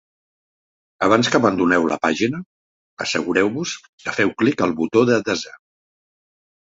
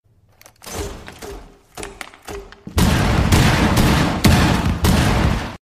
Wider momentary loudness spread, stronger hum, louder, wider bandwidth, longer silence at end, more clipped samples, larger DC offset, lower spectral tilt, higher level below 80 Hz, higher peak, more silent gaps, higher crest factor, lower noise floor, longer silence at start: second, 11 LU vs 20 LU; neither; second, -19 LUFS vs -16 LUFS; second, 8 kHz vs 15.5 kHz; first, 1.1 s vs 0.1 s; neither; neither; about the same, -4.5 dB/octave vs -5 dB/octave; second, -56 dBFS vs -26 dBFS; about the same, -2 dBFS vs -2 dBFS; first, 2.46-2.97 s, 3.89-3.98 s vs none; about the same, 20 dB vs 16 dB; first, under -90 dBFS vs -50 dBFS; first, 1 s vs 0.65 s